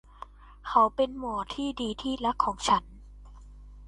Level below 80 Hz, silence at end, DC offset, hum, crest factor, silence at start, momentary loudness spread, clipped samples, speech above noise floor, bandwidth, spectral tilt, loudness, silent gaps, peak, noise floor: -48 dBFS; 0 s; under 0.1%; 50 Hz at -50 dBFS; 22 dB; 0.2 s; 21 LU; under 0.1%; 21 dB; 11.5 kHz; -4 dB/octave; -28 LUFS; none; -8 dBFS; -48 dBFS